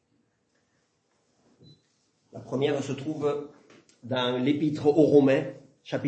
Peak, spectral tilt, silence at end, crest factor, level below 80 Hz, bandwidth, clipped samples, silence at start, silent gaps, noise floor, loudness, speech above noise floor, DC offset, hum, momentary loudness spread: -6 dBFS; -7 dB/octave; 0 s; 20 dB; -72 dBFS; 8.6 kHz; under 0.1%; 2.35 s; none; -72 dBFS; -25 LUFS; 47 dB; under 0.1%; none; 19 LU